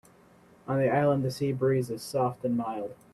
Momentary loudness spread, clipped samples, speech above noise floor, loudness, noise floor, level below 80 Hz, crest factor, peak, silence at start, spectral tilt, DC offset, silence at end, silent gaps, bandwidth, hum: 9 LU; under 0.1%; 30 dB; -28 LUFS; -57 dBFS; -66 dBFS; 16 dB; -12 dBFS; 0.65 s; -7 dB/octave; under 0.1%; 0.2 s; none; 14.5 kHz; none